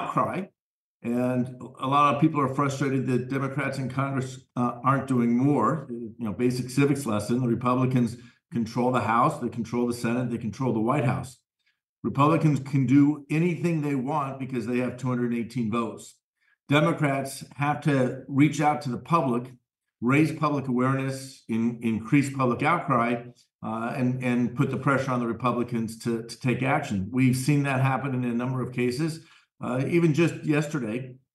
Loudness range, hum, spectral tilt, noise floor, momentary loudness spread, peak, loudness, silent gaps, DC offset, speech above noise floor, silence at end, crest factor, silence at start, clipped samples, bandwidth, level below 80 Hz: 2 LU; none; -7 dB/octave; -75 dBFS; 10 LU; -8 dBFS; -26 LUFS; 0.59-1.00 s, 11.89-12.03 s, 16.23-16.34 s, 16.63-16.67 s, 23.54-23.59 s; under 0.1%; 50 dB; 0.2 s; 18 dB; 0 s; under 0.1%; 12.5 kHz; -66 dBFS